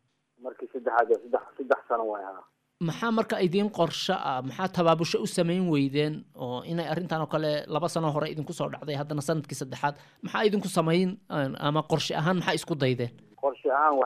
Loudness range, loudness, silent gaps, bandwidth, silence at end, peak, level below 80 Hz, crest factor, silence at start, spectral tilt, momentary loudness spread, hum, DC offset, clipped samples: 3 LU; -28 LUFS; none; 15 kHz; 0 s; -10 dBFS; -70 dBFS; 18 dB; 0.4 s; -5.5 dB/octave; 9 LU; none; under 0.1%; under 0.1%